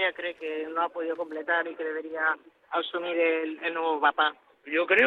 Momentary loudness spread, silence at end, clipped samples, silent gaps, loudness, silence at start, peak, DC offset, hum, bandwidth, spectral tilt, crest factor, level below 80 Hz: 9 LU; 0 s; under 0.1%; none; -28 LUFS; 0 s; -6 dBFS; under 0.1%; none; 4.5 kHz; -4.5 dB/octave; 20 dB; -76 dBFS